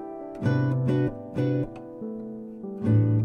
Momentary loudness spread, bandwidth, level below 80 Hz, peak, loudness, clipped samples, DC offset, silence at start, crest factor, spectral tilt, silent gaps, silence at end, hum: 14 LU; 5.8 kHz; -54 dBFS; -12 dBFS; -27 LUFS; under 0.1%; under 0.1%; 0 s; 14 dB; -10 dB/octave; none; 0 s; none